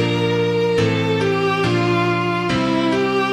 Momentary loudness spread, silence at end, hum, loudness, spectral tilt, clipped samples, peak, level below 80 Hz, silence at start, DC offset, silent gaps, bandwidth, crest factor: 1 LU; 0 s; none; -18 LUFS; -6.5 dB/octave; under 0.1%; -6 dBFS; -46 dBFS; 0 s; under 0.1%; none; 12.5 kHz; 12 dB